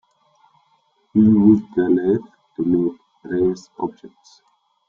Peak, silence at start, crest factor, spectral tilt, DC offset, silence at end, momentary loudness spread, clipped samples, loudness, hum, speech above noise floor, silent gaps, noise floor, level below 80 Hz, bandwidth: -2 dBFS; 1.15 s; 18 dB; -9.5 dB/octave; under 0.1%; 0.8 s; 15 LU; under 0.1%; -19 LUFS; none; 45 dB; none; -63 dBFS; -56 dBFS; 7.2 kHz